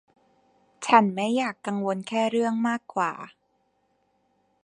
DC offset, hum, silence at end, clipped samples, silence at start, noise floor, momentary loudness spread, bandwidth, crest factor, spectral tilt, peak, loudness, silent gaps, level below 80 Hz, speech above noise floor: under 0.1%; none; 1.35 s; under 0.1%; 0.8 s; -70 dBFS; 11 LU; 10.5 kHz; 26 dB; -5 dB/octave; -2 dBFS; -25 LUFS; none; -78 dBFS; 46 dB